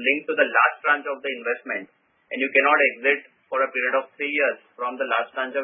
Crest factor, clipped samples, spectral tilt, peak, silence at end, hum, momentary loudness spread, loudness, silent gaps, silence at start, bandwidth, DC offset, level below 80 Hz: 20 dB; under 0.1%; -6.5 dB/octave; -4 dBFS; 0 s; none; 11 LU; -22 LUFS; none; 0 s; 3.8 kHz; under 0.1%; under -90 dBFS